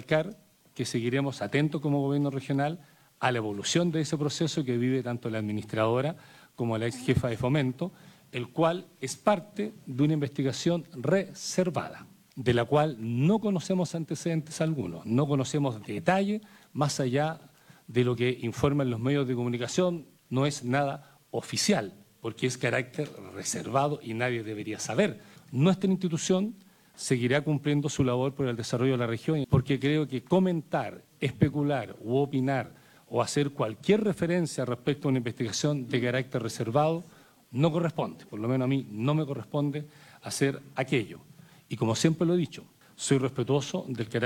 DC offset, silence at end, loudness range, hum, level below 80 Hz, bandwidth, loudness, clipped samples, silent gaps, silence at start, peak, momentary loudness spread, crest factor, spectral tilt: under 0.1%; 0 s; 2 LU; none; -62 dBFS; 17.5 kHz; -29 LUFS; under 0.1%; none; 0 s; -8 dBFS; 10 LU; 20 dB; -5.5 dB/octave